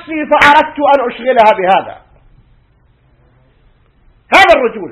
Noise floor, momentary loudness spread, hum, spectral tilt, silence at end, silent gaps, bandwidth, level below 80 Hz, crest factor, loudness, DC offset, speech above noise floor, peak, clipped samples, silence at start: -51 dBFS; 7 LU; none; -4 dB/octave; 0 s; none; 16 kHz; -44 dBFS; 12 dB; -9 LUFS; under 0.1%; 40 dB; 0 dBFS; 1%; 0.05 s